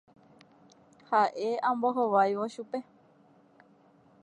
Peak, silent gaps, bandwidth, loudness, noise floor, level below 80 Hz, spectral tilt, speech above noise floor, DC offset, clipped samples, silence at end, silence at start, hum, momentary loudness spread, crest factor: -12 dBFS; none; 10.5 kHz; -29 LUFS; -61 dBFS; -86 dBFS; -5.5 dB/octave; 33 dB; under 0.1%; under 0.1%; 1.4 s; 1.1 s; none; 13 LU; 20 dB